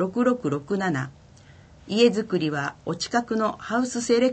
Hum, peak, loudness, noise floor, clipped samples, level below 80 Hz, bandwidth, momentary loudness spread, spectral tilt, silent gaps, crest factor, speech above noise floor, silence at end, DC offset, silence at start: none; -6 dBFS; -25 LUFS; -50 dBFS; under 0.1%; -60 dBFS; 9 kHz; 9 LU; -5 dB/octave; none; 18 dB; 26 dB; 0 s; under 0.1%; 0 s